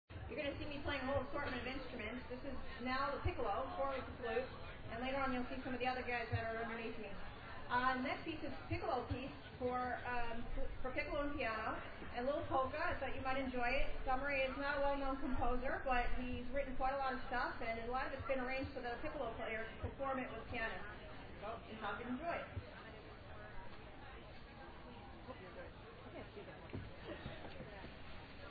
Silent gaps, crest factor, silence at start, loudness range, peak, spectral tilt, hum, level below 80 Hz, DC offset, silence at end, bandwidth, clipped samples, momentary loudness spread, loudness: none; 18 dB; 0.1 s; 12 LU; -24 dBFS; -3.5 dB/octave; none; -50 dBFS; under 0.1%; 0 s; 4.9 kHz; under 0.1%; 15 LU; -43 LUFS